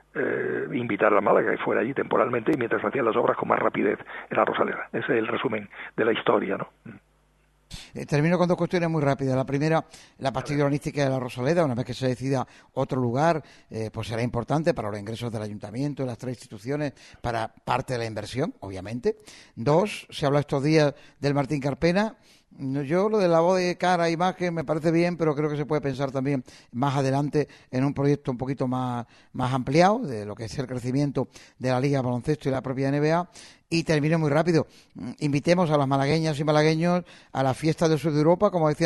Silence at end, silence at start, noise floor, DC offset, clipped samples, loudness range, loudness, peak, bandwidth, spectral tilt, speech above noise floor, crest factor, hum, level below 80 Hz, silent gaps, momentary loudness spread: 0 s; 0.15 s; -63 dBFS; under 0.1%; under 0.1%; 5 LU; -25 LUFS; -4 dBFS; 12.5 kHz; -6.5 dB/octave; 39 dB; 20 dB; none; -56 dBFS; none; 11 LU